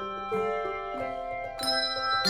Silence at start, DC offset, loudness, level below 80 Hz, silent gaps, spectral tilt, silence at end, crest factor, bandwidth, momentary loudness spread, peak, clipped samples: 0 s; under 0.1%; -30 LUFS; -54 dBFS; none; -2.5 dB/octave; 0 s; 18 dB; 17 kHz; 7 LU; -12 dBFS; under 0.1%